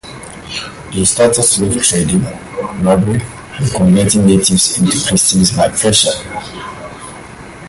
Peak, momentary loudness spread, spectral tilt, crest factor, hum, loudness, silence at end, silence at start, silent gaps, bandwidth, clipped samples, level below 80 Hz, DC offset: 0 dBFS; 19 LU; -4 dB/octave; 14 dB; none; -11 LUFS; 0 s; 0.05 s; none; 12 kHz; under 0.1%; -36 dBFS; under 0.1%